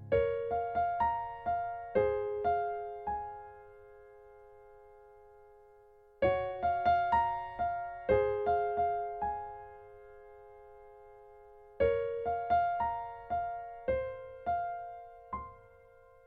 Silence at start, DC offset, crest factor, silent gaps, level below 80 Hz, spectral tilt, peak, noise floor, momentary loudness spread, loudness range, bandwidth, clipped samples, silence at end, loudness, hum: 0 s; under 0.1%; 20 dB; none; -56 dBFS; -8 dB/octave; -16 dBFS; -60 dBFS; 23 LU; 8 LU; 4.8 kHz; under 0.1%; 0.65 s; -33 LUFS; none